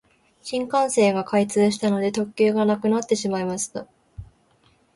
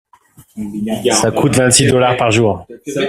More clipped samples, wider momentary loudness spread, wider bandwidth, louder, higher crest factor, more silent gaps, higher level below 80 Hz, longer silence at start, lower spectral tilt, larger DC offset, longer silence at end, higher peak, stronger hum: neither; second, 10 LU vs 15 LU; second, 11.5 kHz vs 16 kHz; second, -22 LUFS vs -13 LUFS; about the same, 14 dB vs 14 dB; neither; second, -56 dBFS vs -44 dBFS; about the same, 0.45 s vs 0.4 s; about the same, -5 dB/octave vs -4 dB/octave; neither; first, 0.7 s vs 0 s; second, -8 dBFS vs 0 dBFS; neither